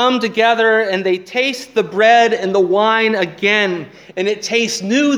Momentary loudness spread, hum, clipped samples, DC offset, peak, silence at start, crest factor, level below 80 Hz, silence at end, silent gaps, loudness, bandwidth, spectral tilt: 8 LU; none; under 0.1%; under 0.1%; 0 dBFS; 0 s; 14 dB; -66 dBFS; 0 s; none; -15 LUFS; 14.5 kHz; -3.5 dB/octave